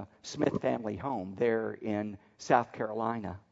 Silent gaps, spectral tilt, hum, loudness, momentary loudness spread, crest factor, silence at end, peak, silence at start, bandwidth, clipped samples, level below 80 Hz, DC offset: none; -6 dB/octave; none; -32 LUFS; 10 LU; 24 dB; 0.1 s; -10 dBFS; 0 s; 7.8 kHz; under 0.1%; -66 dBFS; under 0.1%